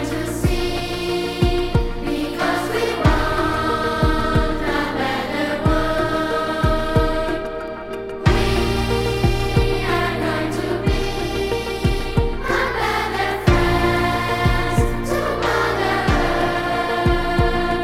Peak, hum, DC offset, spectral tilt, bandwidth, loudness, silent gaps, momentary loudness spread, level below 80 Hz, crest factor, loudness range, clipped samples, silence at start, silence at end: 0 dBFS; none; under 0.1%; -6 dB/octave; 16.5 kHz; -20 LUFS; none; 5 LU; -26 dBFS; 18 dB; 2 LU; under 0.1%; 0 s; 0 s